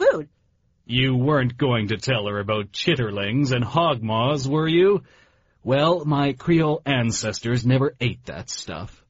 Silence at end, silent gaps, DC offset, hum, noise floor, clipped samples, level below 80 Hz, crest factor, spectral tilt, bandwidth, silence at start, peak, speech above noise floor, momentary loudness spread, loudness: 0.2 s; none; under 0.1%; none; -64 dBFS; under 0.1%; -50 dBFS; 16 dB; -5 dB/octave; 8 kHz; 0 s; -6 dBFS; 43 dB; 10 LU; -22 LUFS